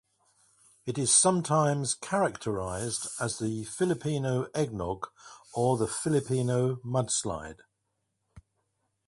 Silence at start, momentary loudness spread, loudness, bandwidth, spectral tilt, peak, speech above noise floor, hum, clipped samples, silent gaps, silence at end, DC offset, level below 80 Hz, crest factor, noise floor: 0.85 s; 13 LU; -29 LUFS; 11.5 kHz; -4.5 dB/octave; -10 dBFS; 51 dB; none; under 0.1%; none; 0.65 s; under 0.1%; -58 dBFS; 20 dB; -80 dBFS